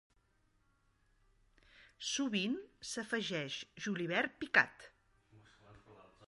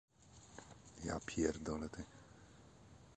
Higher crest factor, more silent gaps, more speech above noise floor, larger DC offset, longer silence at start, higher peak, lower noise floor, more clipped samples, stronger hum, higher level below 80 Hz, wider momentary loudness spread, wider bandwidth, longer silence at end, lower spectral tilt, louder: about the same, 28 dB vs 26 dB; neither; first, 37 dB vs 20 dB; neither; first, 1.8 s vs 0.2 s; first, -14 dBFS vs -20 dBFS; first, -75 dBFS vs -62 dBFS; neither; neither; second, -74 dBFS vs -60 dBFS; second, 12 LU vs 23 LU; first, 11.5 kHz vs 9.8 kHz; about the same, 0.05 s vs 0 s; second, -3 dB/octave vs -5 dB/octave; first, -36 LUFS vs -43 LUFS